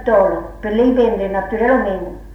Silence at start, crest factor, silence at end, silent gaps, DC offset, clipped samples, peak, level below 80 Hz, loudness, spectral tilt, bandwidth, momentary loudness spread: 0 s; 12 dB; 0 s; none; under 0.1%; under 0.1%; -4 dBFS; -36 dBFS; -16 LUFS; -8 dB/octave; 6.4 kHz; 8 LU